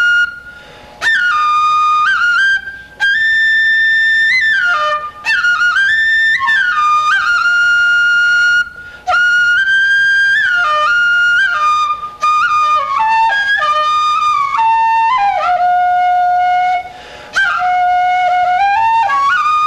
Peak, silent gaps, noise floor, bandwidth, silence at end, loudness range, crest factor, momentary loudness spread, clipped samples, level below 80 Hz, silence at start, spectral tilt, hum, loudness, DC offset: -4 dBFS; none; -35 dBFS; 13 kHz; 0 s; 3 LU; 8 dB; 5 LU; under 0.1%; -50 dBFS; 0 s; 0 dB/octave; none; -11 LUFS; under 0.1%